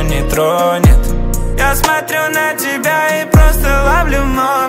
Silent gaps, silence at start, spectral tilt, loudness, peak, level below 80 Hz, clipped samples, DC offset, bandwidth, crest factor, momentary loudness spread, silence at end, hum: none; 0 s; -5 dB/octave; -13 LUFS; 0 dBFS; -14 dBFS; under 0.1%; under 0.1%; 16.5 kHz; 12 dB; 5 LU; 0 s; none